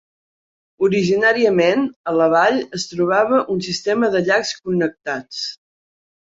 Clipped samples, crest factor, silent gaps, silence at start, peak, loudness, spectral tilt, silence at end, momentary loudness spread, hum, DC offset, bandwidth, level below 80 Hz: under 0.1%; 16 dB; 1.96-2.04 s; 0.8 s; -4 dBFS; -18 LUFS; -5 dB/octave; 0.65 s; 11 LU; none; under 0.1%; 8 kHz; -60 dBFS